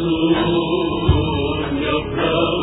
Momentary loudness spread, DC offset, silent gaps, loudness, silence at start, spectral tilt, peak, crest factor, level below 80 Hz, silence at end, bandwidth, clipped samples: 4 LU; under 0.1%; none; -19 LUFS; 0 s; -10 dB/octave; -2 dBFS; 16 dB; -30 dBFS; 0 s; 4 kHz; under 0.1%